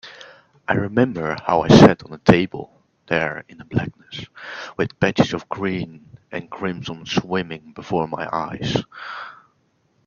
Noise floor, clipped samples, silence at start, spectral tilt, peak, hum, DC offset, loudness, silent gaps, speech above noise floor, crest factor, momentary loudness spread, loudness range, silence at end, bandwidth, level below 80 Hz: -64 dBFS; under 0.1%; 0.05 s; -6.5 dB/octave; 0 dBFS; none; under 0.1%; -20 LUFS; none; 44 dB; 20 dB; 20 LU; 9 LU; 0.75 s; 8 kHz; -48 dBFS